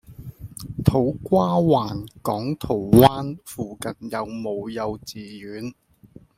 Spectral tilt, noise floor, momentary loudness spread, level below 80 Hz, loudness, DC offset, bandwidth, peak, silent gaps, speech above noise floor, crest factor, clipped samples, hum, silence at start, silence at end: -7 dB/octave; -50 dBFS; 20 LU; -46 dBFS; -22 LUFS; under 0.1%; 16.5 kHz; 0 dBFS; none; 28 dB; 22 dB; under 0.1%; none; 0.1 s; 0.65 s